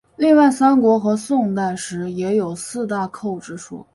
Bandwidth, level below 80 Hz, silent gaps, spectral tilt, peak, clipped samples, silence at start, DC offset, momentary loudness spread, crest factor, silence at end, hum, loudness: 11.5 kHz; -60 dBFS; none; -6 dB/octave; -2 dBFS; under 0.1%; 0.2 s; under 0.1%; 14 LU; 16 dB; 0.1 s; none; -18 LUFS